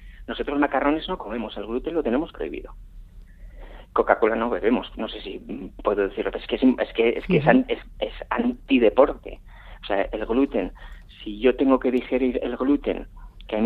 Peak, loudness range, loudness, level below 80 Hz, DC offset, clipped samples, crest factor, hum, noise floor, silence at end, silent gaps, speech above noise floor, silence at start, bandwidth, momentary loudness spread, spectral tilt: 0 dBFS; 5 LU; -23 LUFS; -42 dBFS; under 0.1%; under 0.1%; 24 dB; none; -43 dBFS; 0 s; none; 20 dB; 0 s; 4.6 kHz; 15 LU; -8.5 dB/octave